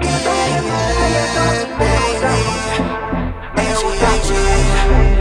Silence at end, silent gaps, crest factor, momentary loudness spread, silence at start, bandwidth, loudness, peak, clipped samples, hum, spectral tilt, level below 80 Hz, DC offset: 0 s; none; 14 dB; 5 LU; 0 s; 11.5 kHz; -16 LUFS; 0 dBFS; under 0.1%; none; -4.5 dB/octave; -18 dBFS; under 0.1%